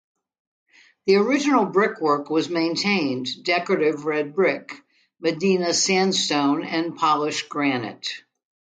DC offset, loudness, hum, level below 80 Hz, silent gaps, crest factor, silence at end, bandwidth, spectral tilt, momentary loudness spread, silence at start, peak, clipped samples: under 0.1%; -22 LUFS; none; -72 dBFS; none; 16 dB; 0.55 s; 9.4 kHz; -3.5 dB/octave; 10 LU; 1.05 s; -6 dBFS; under 0.1%